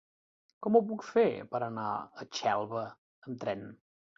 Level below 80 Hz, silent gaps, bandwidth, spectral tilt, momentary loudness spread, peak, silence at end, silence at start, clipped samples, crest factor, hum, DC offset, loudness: -76 dBFS; 2.98-3.22 s; 7.4 kHz; -5.5 dB/octave; 15 LU; -12 dBFS; 0.45 s; 0.6 s; under 0.1%; 22 dB; none; under 0.1%; -32 LUFS